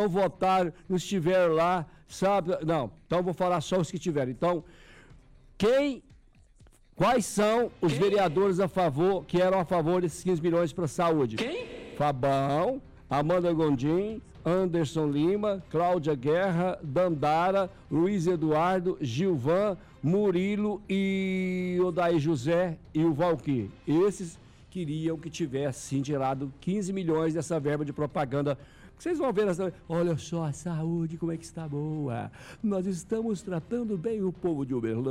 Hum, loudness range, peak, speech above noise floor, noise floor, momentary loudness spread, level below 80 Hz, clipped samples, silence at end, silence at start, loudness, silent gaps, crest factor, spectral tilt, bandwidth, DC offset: none; 5 LU; -18 dBFS; 30 dB; -57 dBFS; 8 LU; -56 dBFS; under 0.1%; 0 s; 0 s; -28 LUFS; none; 10 dB; -6.5 dB/octave; 15.5 kHz; under 0.1%